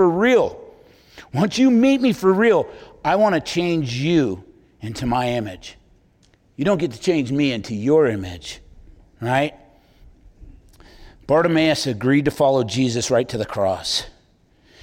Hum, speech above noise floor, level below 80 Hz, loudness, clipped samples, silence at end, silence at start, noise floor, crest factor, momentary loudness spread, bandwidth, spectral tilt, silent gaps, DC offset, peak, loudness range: none; 38 dB; -48 dBFS; -19 LUFS; under 0.1%; 0.7 s; 0 s; -57 dBFS; 14 dB; 16 LU; 16.5 kHz; -5.5 dB/octave; none; under 0.1%; -6 dBFS; 6 LU